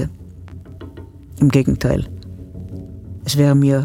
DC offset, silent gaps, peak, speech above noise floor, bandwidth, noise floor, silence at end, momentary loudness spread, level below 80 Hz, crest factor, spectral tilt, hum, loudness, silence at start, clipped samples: under 0.1%; none; 0 dBFS; 22 dB; 16 kHz; -37 dBFS; 0 s; 23 LU; -36 dBFS; 18 dB; -7 dB/octave; none; -17 LUFS; 0 s; under 0.1%